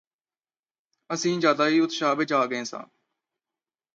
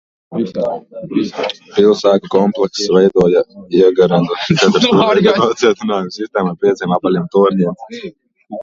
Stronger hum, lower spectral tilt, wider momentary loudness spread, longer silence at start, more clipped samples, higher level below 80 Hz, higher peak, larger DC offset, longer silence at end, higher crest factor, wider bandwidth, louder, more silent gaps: neither; second, -4 dB/octave vs -6 dB/octave; about the same, 12 LU vs 11 LU; first, 1.1 s vs 0.3 s; neither; second, -80 dBFS vs -52 dBFS; second, -6 dBFS vs 0 dBFS; neither; first, 1.1 s vs 0 s; first, 20 dB vs 14 dB; about the same, 7.8 kHz vs 7.6 kHz; second, -24 LUFS vs -14 LUFS; neither